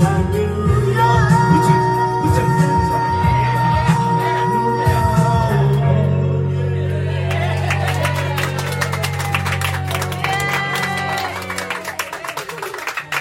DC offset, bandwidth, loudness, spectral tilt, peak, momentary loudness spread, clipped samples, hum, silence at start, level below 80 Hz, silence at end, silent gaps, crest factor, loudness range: under 0.1%; 16.5 kHz; -17 LUFS; -6 dB/octave; -2 dBFS; 9 LU; under 0.1%; none; 0 s; -36 dBFS; 0 s; none; 16 dB; 5 LU